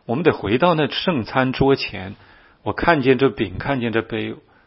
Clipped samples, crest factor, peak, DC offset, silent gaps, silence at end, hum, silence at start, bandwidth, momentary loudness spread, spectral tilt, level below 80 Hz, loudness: under 0.1%; 20 dB; 0 dBFS; under 0.1%; none; 0.25 s; none; 0.1 s; 5.8 kHz; 11 LU; -9.5 dB/octave; -44 dBFS; -19 LUFS